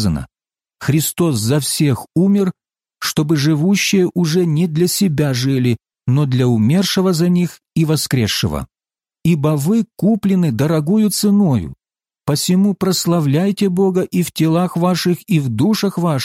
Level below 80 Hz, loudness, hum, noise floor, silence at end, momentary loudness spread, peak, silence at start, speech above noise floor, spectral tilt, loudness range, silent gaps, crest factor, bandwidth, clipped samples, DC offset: -44 dBFS; -16 LUFS; none; under -90 dBFS; 0 s; 6 LU; -4 dBFS; 0 s; over 75 dB; -5.5 dB/octave; 1 LU; none; 12 dB; 16.5 kHz; under 0.1%; under 0.1%